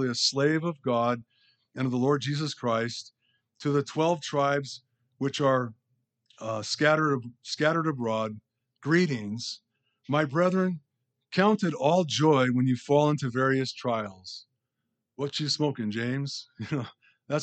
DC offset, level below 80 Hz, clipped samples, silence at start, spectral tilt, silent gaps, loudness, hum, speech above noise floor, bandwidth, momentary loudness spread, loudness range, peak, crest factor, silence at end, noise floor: under 0.1%; -76 dBFS; under 0.1%; 0 s; -5.5 dB/octave; none; -27 LUFS; none; 56 dB; 9 kHz; 14 LU; 5 LU; -8 dBFS; 20 dB; 0 s; -83 dBFS